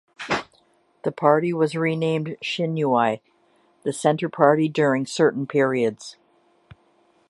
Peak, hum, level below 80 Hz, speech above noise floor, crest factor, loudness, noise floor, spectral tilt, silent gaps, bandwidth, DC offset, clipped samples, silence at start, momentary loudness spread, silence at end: -2 dBFS; none; -66 dBFS; 40 dB; 22 dB; -22 LUFS; -61 dBFS; -6 dB/octave; none; 11.5 kHz; under 0.1%; under 0.1%; 0.2 s; 11 LU; 1.15 s